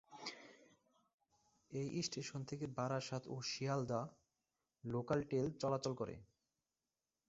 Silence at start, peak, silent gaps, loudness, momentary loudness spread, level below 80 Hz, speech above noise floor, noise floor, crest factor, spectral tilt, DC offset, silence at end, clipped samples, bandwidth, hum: 0.1 s; -24 dBFS; 1.14-1.18 s; -43 LUFS; 11 LU; -74 dBFS; over 48 dB; under -90 dBFS; 20 dB; -5.5 dB/octave; under 0.1%; 1.05 s; under 0.1%; 8 kHz; none